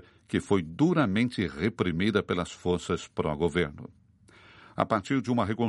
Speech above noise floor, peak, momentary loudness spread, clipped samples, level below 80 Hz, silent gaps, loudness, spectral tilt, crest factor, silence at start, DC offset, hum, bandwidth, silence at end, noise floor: 29 dB; -6 dBFS; 7 LU; under 0.1%; -54 dBFS; none; -28 LUFS; -6.5 dB/octave; 22 dB; 0.3 s; under 0.1%; none; 11.5 kHz; 0 s; -57 dBFS